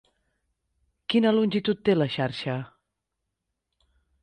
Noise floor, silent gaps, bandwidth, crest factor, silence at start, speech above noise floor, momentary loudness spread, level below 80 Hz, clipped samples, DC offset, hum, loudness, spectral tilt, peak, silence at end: -83 dBFS; none; 9.4 kHz; 18 dB; 1.1 s; 59 dB; 13 LU; -64 dBFS; under 0.1%; under 0.1%; none; -25 LUFS; -7.5 dB/octave; -10 dBFS; 1.55 s